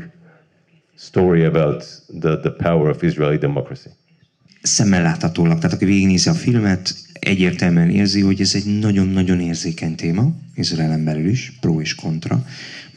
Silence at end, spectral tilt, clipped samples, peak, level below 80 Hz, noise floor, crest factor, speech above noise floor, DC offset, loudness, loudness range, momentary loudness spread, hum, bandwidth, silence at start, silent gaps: 0.1 s; -5.5 dB/octave; under 0.1%; -2 dBFS; -48 dBFS; -57 dBFS; 16 dB; 40 dB; under 0.1%; -18 LUFS; 4 LU; 9 LU; none; 10.5 kHz; 0 s; none